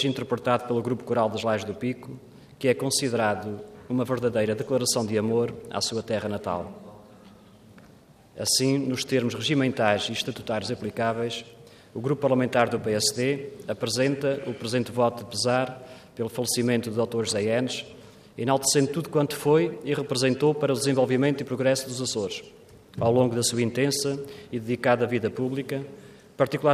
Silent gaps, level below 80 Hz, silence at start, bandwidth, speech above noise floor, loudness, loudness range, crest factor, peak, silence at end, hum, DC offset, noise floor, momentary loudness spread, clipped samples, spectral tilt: none; -64 dBFS; 0 s; 15.5 kHz; 28 dB; -26 LUFS; 3 LU; 20 dB; -6 dBFS; 0 s; none; under 0.1%; -53 dBFS; 11 LU; under 0.1%; -4.5 dB/octave